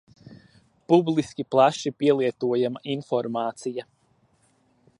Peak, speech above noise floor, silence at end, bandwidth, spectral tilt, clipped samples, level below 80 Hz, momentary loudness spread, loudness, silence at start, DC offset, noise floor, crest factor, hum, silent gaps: -6 dBFS; 41 dB; 1.15 s; 11 kHz; -6 dB/octave; under 0.1%; -68 dBFS; 11 LU; -24 LUFS; 0.3 s; under 0.1%; -65 dBFS; 20 dB; none; none